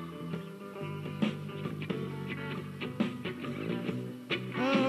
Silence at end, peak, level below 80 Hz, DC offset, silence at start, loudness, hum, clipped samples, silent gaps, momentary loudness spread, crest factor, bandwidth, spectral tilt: 0 s; -16 dBFS; -72 dBFS; under 0.1%; 0 s; -36 LUFS; none; under 0.1%; none; 6 LU; 18 dB; 13.5 kHz; -6.5 dB/octave